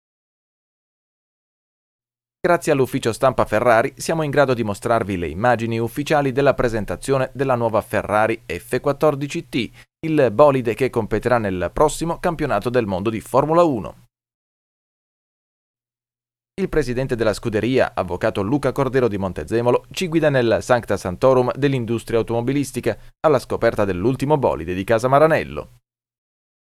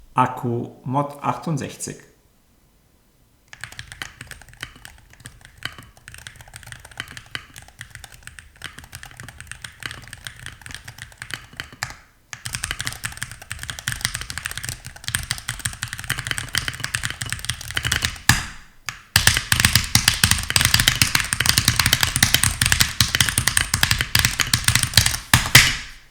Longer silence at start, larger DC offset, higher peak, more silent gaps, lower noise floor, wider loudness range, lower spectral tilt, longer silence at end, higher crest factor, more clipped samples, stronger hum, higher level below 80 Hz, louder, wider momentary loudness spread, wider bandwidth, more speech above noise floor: first, 2.45 s vs 0.15 s; neither; about the same, 0 dBFS vs 0 dBFS; first, 14.34-15.74 s vs none; first, under -90 dBFS vs -58 dBFS; second, 5 LU vs 21 LU; first, -6 dB/octave vs -1.5 dB/octave; first, 1.15 s vs 0.1 s; about the same, 20 dB vs 24 dB; neither; neither; about the same, -42 dBFS vs -38 dBFS; about the same, -20 LUFS vs -19 LUFS; second, 8 LU vs 22 LU; second, 15 kHz vs over 20 kHz; first, over 71 dB vs 34 dB